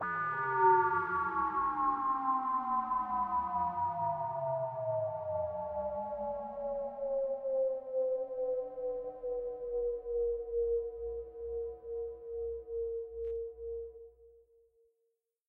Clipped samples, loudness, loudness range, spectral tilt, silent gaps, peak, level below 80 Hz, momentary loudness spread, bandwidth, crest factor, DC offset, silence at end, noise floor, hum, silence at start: under 0.1%; -35 LUFS; 10 LU; -9.5 dB/octave; none; -16 dBFS; -60 dBFS; 10 LU; 4.2 kHz; 18 dB; under 0.1%; 1.2 s; -82 dBFS; none; 0 s